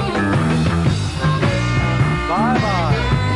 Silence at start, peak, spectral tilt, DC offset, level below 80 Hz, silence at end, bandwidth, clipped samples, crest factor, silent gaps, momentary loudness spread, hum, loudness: 0 s; -4 dBFS; -6.5 dB/octave; 0.3%; -30 dBFS; 0 s; 11.5 kHz; under 0.1%; 12 dB; none; 2 LU; none; -17 LUFS